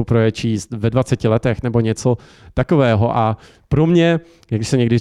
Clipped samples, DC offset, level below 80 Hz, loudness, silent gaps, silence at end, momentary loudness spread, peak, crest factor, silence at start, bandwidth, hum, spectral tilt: under 0.1%; under 0.1%; -40 dBFS; -17 LUFS; none; 0 s; 9 LU; -4 dBFS; 12 dB; 0 s; 11 kHz; none; -7 dB/octave